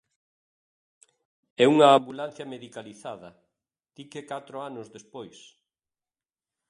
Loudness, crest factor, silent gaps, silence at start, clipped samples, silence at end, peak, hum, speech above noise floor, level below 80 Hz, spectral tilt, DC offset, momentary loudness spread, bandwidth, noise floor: -21 LUFS; 24 dB; none; 1.6 s; under 0.1%; 1.4 s; -6 dBFS; none; over 64 dB; -78 dBFS; -5 dB/octave; under 0.1%; 25 LU; 11 kHz; under -90 dBFS